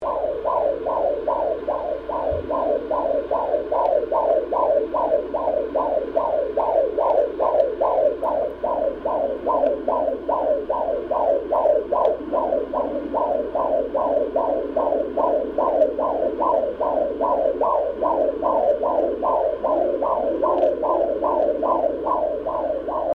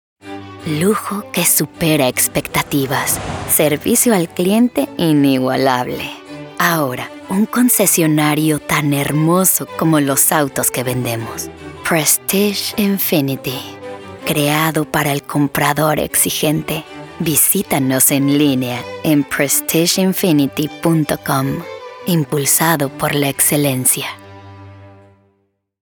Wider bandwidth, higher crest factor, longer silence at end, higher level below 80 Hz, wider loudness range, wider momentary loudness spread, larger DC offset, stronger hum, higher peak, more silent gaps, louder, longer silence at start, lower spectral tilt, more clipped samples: second, 4.8 kHz vs over 20 kHz; about the same, 16 dB vs 16 dB; second, 0 s vs 0.9 s; about the same, -48 dBFS vs -48 dBFS; about the same, 2 LU vs 3 LU; second, 4 LU vs 12 LU; neither; neither; second, -6 dBFS vs 0 dBFS; neither; second, -22 LUFS vs -15 LUFS; second, 0 s vs 0.25 s; first, -8.5 dB/octave vs -4 dB/octave; neither